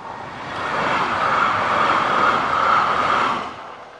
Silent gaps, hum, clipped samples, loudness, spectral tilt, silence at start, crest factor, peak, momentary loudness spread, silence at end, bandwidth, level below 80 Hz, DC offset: none; none; under 0.1%; -18 LUFS; -4 dB/octave; 0 s; 14 dB; -6 dBFS; 14 LU; 0 s; 11 kHz; -52 dBFS; under 0.1%